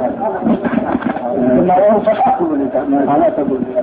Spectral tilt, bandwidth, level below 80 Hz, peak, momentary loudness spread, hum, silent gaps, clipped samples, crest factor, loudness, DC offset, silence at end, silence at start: -12 dB/octave; 4.2 kHz; -46 dBFS; -2 dBFS; 7 LU; none; none; under 0.1%; 12 dB; -14 LUFS; under 0.1%; 0 s; 0 s